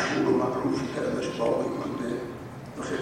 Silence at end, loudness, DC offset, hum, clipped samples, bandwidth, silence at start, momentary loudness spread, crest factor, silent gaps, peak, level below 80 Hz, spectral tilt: 0 s; -28 LUFS; under 0.1%; none; under 0.1%; 16 kHz; 0 s; 13 LU; 16 dB; none; -12 dBFS; -56 dBFS; -5.5 dB/octave